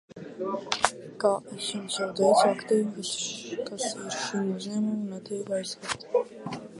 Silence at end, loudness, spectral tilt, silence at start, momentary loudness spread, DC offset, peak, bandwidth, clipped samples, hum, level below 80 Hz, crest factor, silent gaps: 0 s; -29 LUFS; -3.5 dB/octave; 0.15 s; 12 LU; under 0.1%; -2 dBFS; 11.5 kHz; under 0.1%; none; -70 dBFS; 28 dB; none